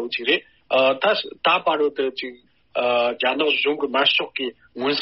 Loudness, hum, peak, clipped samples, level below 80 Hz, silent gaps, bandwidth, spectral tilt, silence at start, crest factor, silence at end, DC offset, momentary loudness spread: -21 LUFS; none; -4 dBFS; under 0.1%; -68 dBFS; none; 5.8 kHz; 0.5 dB/octave; 0 s; 18 dB; 0 s; under 0.1%; 10 LU